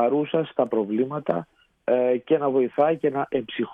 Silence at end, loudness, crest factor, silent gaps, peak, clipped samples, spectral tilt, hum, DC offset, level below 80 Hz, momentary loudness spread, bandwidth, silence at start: 0 s; -24 LUFS; 16 dB; none; -8 dBFS; under 0.1%; -9 dB/octave; none; under 0.1%; -66 dBFS; 6 LU; 3.9 kHz; 0 s